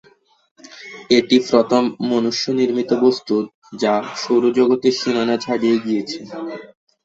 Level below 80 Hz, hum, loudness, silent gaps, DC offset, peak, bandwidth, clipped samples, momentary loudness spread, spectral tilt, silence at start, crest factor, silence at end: -60 dBFS; none; -18 LUFS; 3.54-3.62 s; under 0.1%; -2 dBFS; 7.8 kHz; under 0.1%; 15 LU; -4.5 dB/octave; 0.7 s; 18 dB; 0.4 s